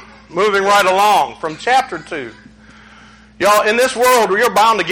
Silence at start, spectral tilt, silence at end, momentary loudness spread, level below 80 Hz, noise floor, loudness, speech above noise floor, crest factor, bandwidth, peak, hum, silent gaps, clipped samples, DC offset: 0 s; -2.5 dB/octave; 0 s; 14 LU; -52 dBFS; -42 dBFS; -13 LUFS; 29 dB; 14 dB; 18 kHz; 0 dBFS; none; none; under 0.1%; under 0.1%